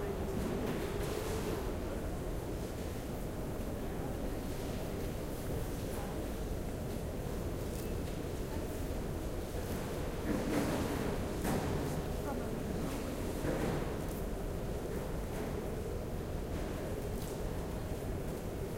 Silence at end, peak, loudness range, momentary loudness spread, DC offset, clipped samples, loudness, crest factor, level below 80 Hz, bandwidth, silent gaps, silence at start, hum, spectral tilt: 0 s; -22 dBFS; 3 LU; 5 LU; under 0.1%; under 0.1%; -39 LUFS; 16 dB; -44 dBFS; 16 kHz; none; 0 s; none; -6 dB/octave